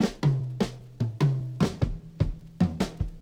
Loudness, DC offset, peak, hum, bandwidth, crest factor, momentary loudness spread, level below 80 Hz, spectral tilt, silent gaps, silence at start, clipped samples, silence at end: -29 LUFS; under 0.1%; -10 dBFS; none; 15 kHz; 16 dB; 6 LU; -40 dBFS; -7.5 dB/octave; none; 0 s; under 0.1%; 0 s